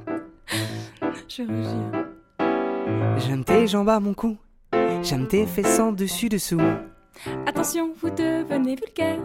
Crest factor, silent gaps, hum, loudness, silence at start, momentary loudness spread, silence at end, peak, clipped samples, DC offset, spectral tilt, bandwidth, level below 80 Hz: 18 dB; none; none; -24 LUFS; 0 s; 12 LU; 0 s; -6 dBFS; under 0.1%; under 0.1%; -5.5 dB/octave; 16.5 kHz; -50 dBFS